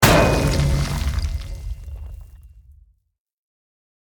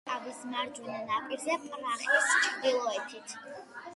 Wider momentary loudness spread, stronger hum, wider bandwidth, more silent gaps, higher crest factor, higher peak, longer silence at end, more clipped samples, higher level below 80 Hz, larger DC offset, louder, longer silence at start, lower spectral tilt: first, 21 LU vs 17 LU; neither; first, over 20 kHz vs 11.5 kHz; neither; about the same, 22 dB vs 20 dB; first, 0 dBFS vs -12 dBFS; first, 1.7 s vs 0 s; neither; first, -28 dBFS vs -82 dBFS; neither; first, -20 LUFS vs -31 LUFS; about the same, 0 s vs 0.05 s; first, -5 dB/octave vs -1 dB/octave